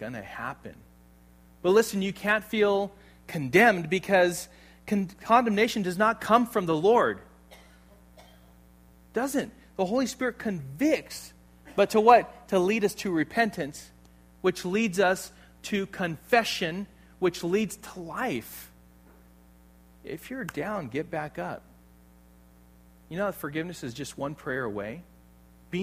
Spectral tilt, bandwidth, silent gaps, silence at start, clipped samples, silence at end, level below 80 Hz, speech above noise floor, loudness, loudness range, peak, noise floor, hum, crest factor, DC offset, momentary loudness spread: -5 dB/octave; 15.5 kHz; none; 0 s; under 0.1%; 0 s; -58 dBFS; 29 dB; -27 LUFS; 12 LU; -4 dBFS; -56 dBFS; none; 24 dB; under 0.1%; 18 LU